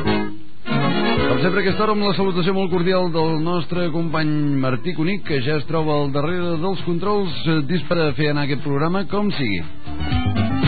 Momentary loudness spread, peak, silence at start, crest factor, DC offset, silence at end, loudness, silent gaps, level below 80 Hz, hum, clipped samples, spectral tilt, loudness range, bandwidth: 4 LU; -4 dBFS; 0 s; 16 dB; 7%; 0 s; -21 LUFS; none; -40 dBFS; none; under 0.1%; -5 dB/octave; 2 LU; 4.8 kHz